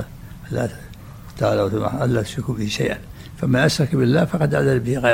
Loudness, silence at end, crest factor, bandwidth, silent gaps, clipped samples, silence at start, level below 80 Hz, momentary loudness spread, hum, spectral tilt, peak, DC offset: -20 LUFS; 0 s; 16 dB; 16.5 kHz; none; under 0.1%; 0 s; -42 dBFS; 21 LU; none; -6 dB/octave; -4 dBFS; under 0.1%